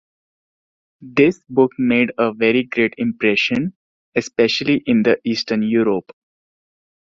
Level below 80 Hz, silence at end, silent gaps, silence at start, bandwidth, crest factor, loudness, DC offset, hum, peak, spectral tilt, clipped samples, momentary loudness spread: -58 dBFS; 1.2 s; 3.76-4.12 s; 1 s; 7.6 kHz; 18 dB; -18 LUFS; under 0.1%; none; -2 dBFS; -5.5 dB/octave; under 0.1%; 7 LU